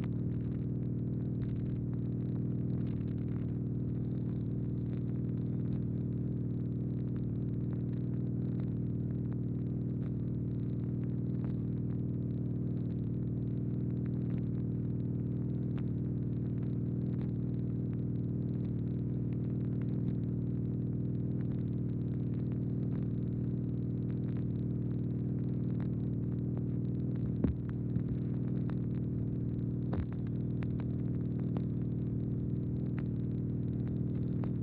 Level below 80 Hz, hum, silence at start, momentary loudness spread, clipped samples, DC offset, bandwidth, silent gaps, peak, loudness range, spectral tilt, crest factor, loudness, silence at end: -50 dBFS; 60 Hz at -50 dBFS; 0 s; 1 LU; under 0.1%; under 0.1%; 3.9 kHz; none; -18 dBFS; 1 LU; -12.5 dB/octave; 16 dB; -36 LUFS; 0 s